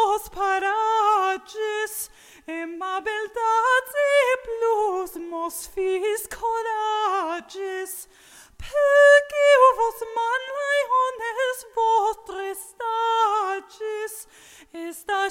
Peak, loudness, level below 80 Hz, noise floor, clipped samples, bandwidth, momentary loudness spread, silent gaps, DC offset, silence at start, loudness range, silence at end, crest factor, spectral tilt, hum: -4 dBFS; -22 LUFS; -56 dBFS; -50 dBFS; under 0.1%; 17 kHz; 16 LU; none; under 0.1%; 0 s; 8 LU; 0 s; 18 dB; -1.5 dB/octave; none